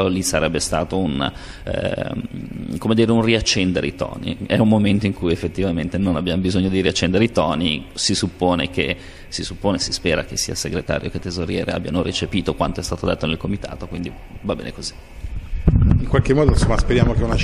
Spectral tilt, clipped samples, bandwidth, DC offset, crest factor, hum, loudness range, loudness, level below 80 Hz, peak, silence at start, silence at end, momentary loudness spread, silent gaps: -5 dB/octave; under 0.1%; 13.5 kHz; under 0.1%; 20 dB; none; 5 LU; -20 LUFS; -28 dBFS; 0 dBFS; 0 s; 0 s; 12 LU; none